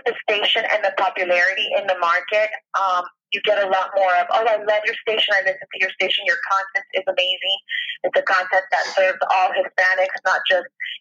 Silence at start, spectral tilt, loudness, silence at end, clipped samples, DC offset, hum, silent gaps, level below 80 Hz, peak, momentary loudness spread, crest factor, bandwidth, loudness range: 0.05 s; -1 dB/octave; -19 LUFS; 0.05 s; under 0.1%; under 0.1%; none; none; -86 dBFS; -6 dBFS; 5 LU; 14 dB; 7.6 kHz; 1 LU